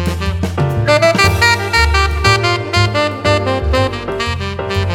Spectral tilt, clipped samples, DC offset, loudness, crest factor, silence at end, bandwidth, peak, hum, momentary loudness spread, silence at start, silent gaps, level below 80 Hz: -4.5 dB/octave; under 0.1%; under 0.1%; -14 LUFS; 14 dB; 0 s; 17 kHz; 0 dBFS; none; 8 LU; 0 s; none; -24 dBFS